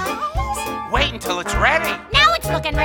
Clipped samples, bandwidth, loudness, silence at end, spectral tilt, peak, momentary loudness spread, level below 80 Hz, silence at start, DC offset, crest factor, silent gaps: under 0.1%; 18.5 kHz; -18 LUFS; 0 s; -3.5 dB/octave; 0 dBFS; 10 LU; -30 dBFS; 0 s; under 0.1%; 18 dB; none